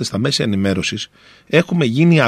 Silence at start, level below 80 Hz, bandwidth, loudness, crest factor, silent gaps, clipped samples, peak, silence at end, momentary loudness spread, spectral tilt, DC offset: 0 s; -52 dBFS; 12.5 kHz; -17 LUFS; 16 dB; none; under 0.1%; 0 dBFS; 0 s; 10 LU; -5.5 dB/octave; under 0.1%